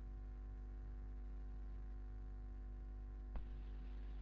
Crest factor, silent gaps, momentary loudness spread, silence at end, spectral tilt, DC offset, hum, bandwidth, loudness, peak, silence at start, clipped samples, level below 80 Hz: 14 dB; none; 1 LU; 0 s; -8 dB/octave; under 0.1%; 50 Hz at -50 dBFS; 4.2 kHz; -54 LUFS; -34 dBFS; 0 s; under 0.1%; -50 dBFS